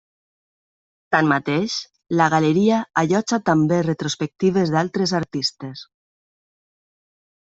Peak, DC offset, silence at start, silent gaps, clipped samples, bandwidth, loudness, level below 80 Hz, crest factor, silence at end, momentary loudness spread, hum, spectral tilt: -2 dBFS; under 0.1%; 1.1 s; none; under 0.1%; 8 kHz; -20 LUFS; -62 dBFS; 18 dB; 1.75 s; 8 LU; none; -5.5 dB/octave